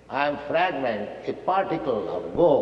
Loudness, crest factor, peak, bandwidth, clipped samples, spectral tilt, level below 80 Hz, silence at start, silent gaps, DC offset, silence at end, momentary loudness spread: -25 LUFS; 18 dB; -6 dBFS; 6.6 kHz; under 0.1%; -7.5 dB/octave; -56 dBFS; 0.1 s; none; under 0.1%; 0 s; 8 LU